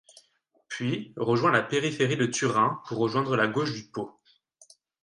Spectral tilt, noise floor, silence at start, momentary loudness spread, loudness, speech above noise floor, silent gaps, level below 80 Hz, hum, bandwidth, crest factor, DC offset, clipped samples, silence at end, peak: -5 dB/octave; -69 dBFS; 0.7 s; 13 LU; -27 LUFS; 42 dB; none; -68 dBFS; none; 11 kHz; 20 dB; under 0.1%; under 0.1%; 0.95 s; -8 dBFS